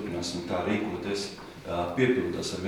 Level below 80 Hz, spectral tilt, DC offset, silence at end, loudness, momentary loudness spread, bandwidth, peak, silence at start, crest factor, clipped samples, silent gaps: -56 dBFS; -5 dB/octave; under 0.1%; 0 s; -30 LUFS; 9 LU; 17.5 kHz; -12 dBFS; 0 s; 18 dB; under 0.1%; none